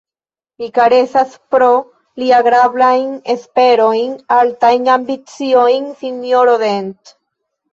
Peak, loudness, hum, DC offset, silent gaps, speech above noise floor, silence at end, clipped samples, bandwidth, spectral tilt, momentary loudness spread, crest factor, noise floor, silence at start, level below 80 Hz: -2 dBFS; -13 LUFS; none; under 0.1%; none; over 78 dB; 0.8 s; under 0.1%; 7.6 kHz; -4.5 dB/octave; 11 LU; 12 dB; under -90 dBFS; 0.6 s; -62 dBFS